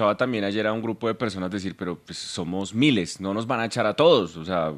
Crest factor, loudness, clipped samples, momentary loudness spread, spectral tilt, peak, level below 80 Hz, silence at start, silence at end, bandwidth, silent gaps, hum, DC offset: 20 dB; -24 LUFS; under 0.1%; 12 LU; -5 dB/octave; -6 dBFS; -64 dBFS; 0 s; 0 s; 13 kHz; none; none; under 0.1%